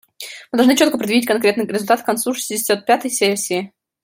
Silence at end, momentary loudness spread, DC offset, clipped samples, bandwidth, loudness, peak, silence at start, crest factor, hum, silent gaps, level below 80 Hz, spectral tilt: 0.35 s; 9 LU; under 0.1%; under 0.1%; 16.5 kHz; -17 LUFS; -2 dBFS; 0.2 s; 16 dB; none; none; -64 dBFS; -3 dB/octave